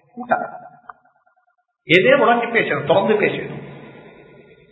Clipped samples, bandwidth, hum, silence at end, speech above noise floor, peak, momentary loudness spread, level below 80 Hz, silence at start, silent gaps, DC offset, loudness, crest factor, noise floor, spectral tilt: under 0.1%; 8 kHz; none; 0.7 s; 49 dB; 0 dBFS; 20 LU; -62 dBFS; 0.15 s; none; under 0.1%; -17 LUFS; 20 dB; -66 dBFS; -7 dB/octave